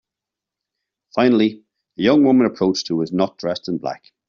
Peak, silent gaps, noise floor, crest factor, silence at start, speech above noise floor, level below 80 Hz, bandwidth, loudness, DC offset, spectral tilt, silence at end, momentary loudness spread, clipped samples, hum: -4 dBFS; none; -86 dBFS; 16 dB; 1.15 s; 68 dB; -60 dBFS; 7.2 kHz; -18 LUFS; under 0.1%; -5 dB/octave; 0.35 s; 11 LU; under 0.1%; none